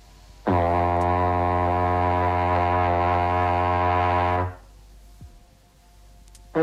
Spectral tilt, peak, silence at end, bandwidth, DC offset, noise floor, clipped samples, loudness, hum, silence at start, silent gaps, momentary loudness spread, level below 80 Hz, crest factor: -8 dB/octave; -8 dBFS; 0 s; 8.4 kHz; under 0.1%; -54 dBFS; under 0.1%; -22 LUFS; none; 0.45 s; none; 3 LU; -42 dBFS; 14 dB